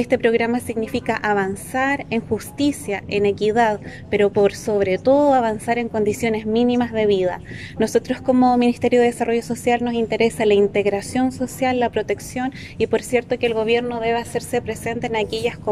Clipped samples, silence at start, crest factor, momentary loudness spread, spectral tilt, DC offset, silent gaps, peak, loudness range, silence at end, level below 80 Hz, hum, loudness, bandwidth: under 0.1%; 0 s; 14 dB; 8 LU; -5 dB/octave; under 0.1%; none; -4 dBFS; 3 LU; 0 s; -48 dBFS; none; -20 LUFS; 15 kHz